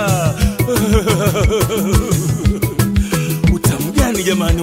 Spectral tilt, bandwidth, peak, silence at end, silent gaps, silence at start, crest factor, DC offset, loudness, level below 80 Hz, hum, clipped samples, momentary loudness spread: -5.5 dB/octave; 16.5 kHz; 0 dBFS; 0 s; none; 0 s; 14 dB; under 0.1%; -15 LUFS; -22 dBFS; none; under 0.1%; 3 LU